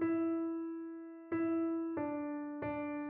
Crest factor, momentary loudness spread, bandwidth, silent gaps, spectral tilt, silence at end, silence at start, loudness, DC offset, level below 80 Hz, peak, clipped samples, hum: 12 dB; 9 LU; 3.2 kHz; none; -7.5 dB/octave; 0 s; 0 s; -38 LUFS; under 0.1%; -72 dBFS; -26 dBFS; under 0.1%; none